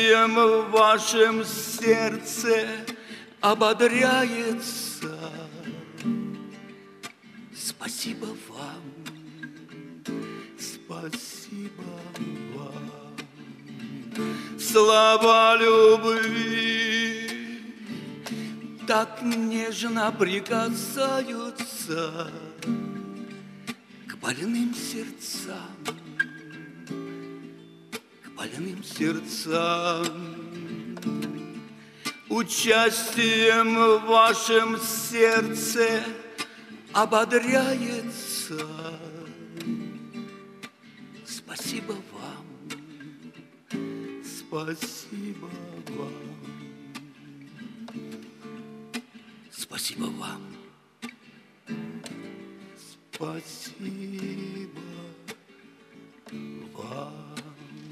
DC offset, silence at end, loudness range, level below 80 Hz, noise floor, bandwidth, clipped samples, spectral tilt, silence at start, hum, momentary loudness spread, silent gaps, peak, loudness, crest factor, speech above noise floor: under 0.1%; 0 s; 18 LU; -76 dBFS; -54 dBFS; 15.5 kHz; under 0.1%; -3 dB/octave; 0 s; none; 23 LU; none; -6 dBFS; -24 LUFS; 20 dB; 30 dB